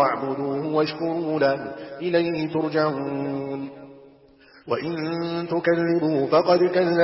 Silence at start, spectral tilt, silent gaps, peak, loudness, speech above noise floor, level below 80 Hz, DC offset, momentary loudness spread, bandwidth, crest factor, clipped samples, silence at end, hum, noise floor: 0 s; -10.5 dB/octave; none; -6 dBFS; -23 LUFS; 30 dB; -64 dBFS; under 0.1%; 10 LU; 5.8 kHz; 16 dB; under 0.1%; 0 s; none; -52 dBFS